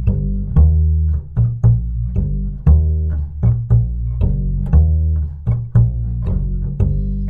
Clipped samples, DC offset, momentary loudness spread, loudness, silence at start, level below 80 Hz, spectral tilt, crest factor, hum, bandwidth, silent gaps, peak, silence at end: under 0.1%; under 0.1%; 7 LU; -17 LUFS; 0 s; -18 dBFS; -12.5 dB/octave; 14 dB; none; 1.8 kHz; none; -2 dBFS; 0 s